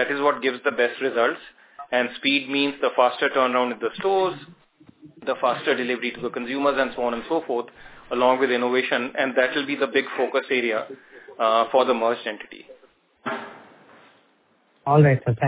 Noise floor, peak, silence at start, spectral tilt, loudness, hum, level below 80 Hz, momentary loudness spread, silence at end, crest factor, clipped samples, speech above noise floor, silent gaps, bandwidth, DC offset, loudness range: -62 dBFS; -4 dBFS; 0 s; -9.5 dB/octave; -22 LUFS; none; -64 dBFS; 13 LU; 0 s; 20 dB; under 0.1%; 40 dB; none; 4 kHz; under 0.1%; 3 LU